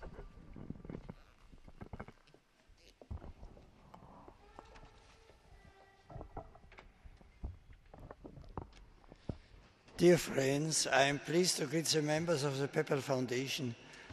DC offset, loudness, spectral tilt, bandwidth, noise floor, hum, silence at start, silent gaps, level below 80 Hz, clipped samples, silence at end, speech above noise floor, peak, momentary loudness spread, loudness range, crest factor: under 0.1%; -33 LUFS; -4 dB/octave; 13 kHz; -67 dBFS; none; 0 s; none; -58 dBFS; under 0.1%; 0 s; 33 dB; -16 dBFS; 26 LU; 24 LU; 24 dB